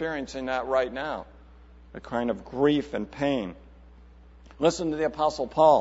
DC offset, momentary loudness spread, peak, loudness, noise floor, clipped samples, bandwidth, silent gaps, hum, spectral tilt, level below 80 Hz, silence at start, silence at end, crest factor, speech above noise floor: under 0.1%; 12 LU; -6 dBFS; -27 LUFS; -50 dBFS; under 0.1%; 8 kHz; none; none; -5.5 dB/octave; -50 dBFS; 0 s; 0 s; 20 dB; 25 dB